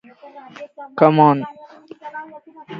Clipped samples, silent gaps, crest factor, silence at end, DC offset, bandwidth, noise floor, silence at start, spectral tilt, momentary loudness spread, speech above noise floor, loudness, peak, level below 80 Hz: under 0.1%; none; 20 dB; 0 s; under 0.1%; 6.2 kHz; -40 dBFS; 0.35 s; -9.5 dB/octave; 26 LU; 23 dB; -15 LUFS; 0 dBFS; -68 dBFS